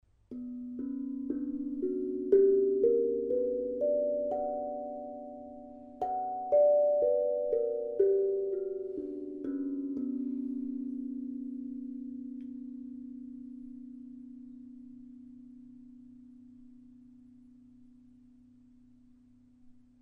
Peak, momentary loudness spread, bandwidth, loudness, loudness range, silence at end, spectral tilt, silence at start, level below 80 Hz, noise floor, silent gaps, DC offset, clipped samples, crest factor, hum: -12 dBFS; 23 LU; 2.3 kHz; -32 LUFS; 20 LU; 0.25 s; -10 dB/octave; 0.3 s; -68 dBFS; -61 dBFS; none; under 0.1%; under 0.1%; 20 dB; none